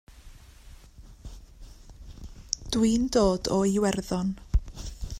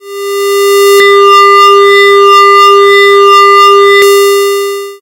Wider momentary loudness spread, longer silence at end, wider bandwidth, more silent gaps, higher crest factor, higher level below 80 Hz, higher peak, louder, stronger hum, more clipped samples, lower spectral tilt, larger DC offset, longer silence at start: first, 24 LU vs 9 LU; about the same, 0 s vs 0.05 s; about the same, 15.5 kHz vs 16.5 kHz; neither; first, 22 dB vs 4 dB; first, -38 dBFS vs -60 dBFS; second, -6 dBFS vs 0 dBFS; second, -26 LUFS vs -3 LUFS; neither; second, under 0.1% vs 10%; first, -5.5 dB/octave vs -0.5 dB/octave; neither; about the same, 0.15 s vs 0.05 s